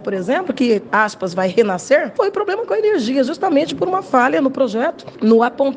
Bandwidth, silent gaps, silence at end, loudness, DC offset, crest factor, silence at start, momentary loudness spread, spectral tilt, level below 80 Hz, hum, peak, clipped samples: 9.6 kHz; none; 0 s; -17 LUFS; under 0.1%; 16 dB; 0 s; 6 LU; -5.5 dB/octave; -62 dBFS; none; 0 dBFS; under 0.1%